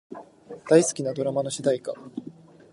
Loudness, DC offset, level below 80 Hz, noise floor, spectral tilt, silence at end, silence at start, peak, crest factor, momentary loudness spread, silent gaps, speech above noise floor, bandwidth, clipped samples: -24 LUFS; under 0.1%; -70 dBFS; -44 dBFS; -5 dB/octave; 0.4 s; 0.1 s; -4 dBFS; 22 dB; 24 LU; none; 20 dB; 11.5 kHz; under 0.1%